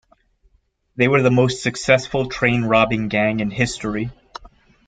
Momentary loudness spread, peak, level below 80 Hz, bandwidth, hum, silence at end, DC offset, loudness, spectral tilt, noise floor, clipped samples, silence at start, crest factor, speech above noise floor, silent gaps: 17 LU; -2 dBFS; -46 dBFS; 9.4 kHz; none; 0.4 s; under 0.1%; -18 LUFS; -5.5 dB/octave; -61 dBFS; under 0.1%; 0.95 s; 18 dB; 43 dB; none